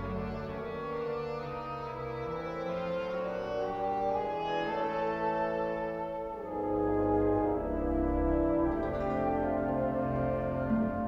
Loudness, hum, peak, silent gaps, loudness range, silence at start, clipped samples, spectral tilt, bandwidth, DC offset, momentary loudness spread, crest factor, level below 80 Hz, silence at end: -33 LUFS; none; -18 dBFS; none; 5 LU; 0 s; under 0.1%; -8.5 dB/octave; 7 kHz; under 0.1%; 9 LU; 14 dB; -44 dBFS; 0 s